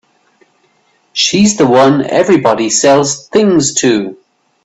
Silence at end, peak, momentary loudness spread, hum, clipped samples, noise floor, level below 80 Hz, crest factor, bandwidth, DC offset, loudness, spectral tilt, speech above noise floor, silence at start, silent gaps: 0.5 s; 0 dBFS; 5 LU; none; under 0.1%; -55 dBFS; -52 dBFS; 12 dB; 8.4 kHz; under 0.1%; -10 LUFS; -4 dB/octave; 45 dB; 1.15 s; none